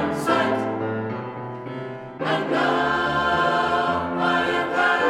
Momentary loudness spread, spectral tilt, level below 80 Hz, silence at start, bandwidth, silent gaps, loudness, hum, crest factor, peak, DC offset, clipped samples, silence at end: 12 LU; -5.5 dB/octave; -52 dBFS; 0 s; 15.5 kHz; none; -22 LUFS; none; 16 dB; -6 dBFS; under 0.1%; under 0.1%; 0 s